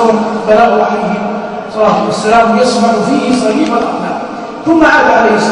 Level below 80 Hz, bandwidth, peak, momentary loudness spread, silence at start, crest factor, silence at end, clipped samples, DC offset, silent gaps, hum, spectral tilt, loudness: -42 dBFS; 11 kHz; 0 dBFS; 11 LU; 0 s; 10 dB; 0 s; 0.3%; under 0.1%; none; none; -5 dB/octave; -10 LUFS